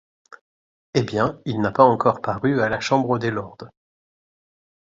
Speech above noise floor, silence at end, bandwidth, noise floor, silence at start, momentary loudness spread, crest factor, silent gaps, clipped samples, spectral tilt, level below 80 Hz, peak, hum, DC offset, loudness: over 70 dB; 1.2 s; 7.8 kHz; under -90 dBFS; 0.95 s; 10 LU; 22 dB; none; under 0.1%; -6.5 dB/octave; -54 dBFS; 0 dBFS; none; under 0.1%; -21 LUFS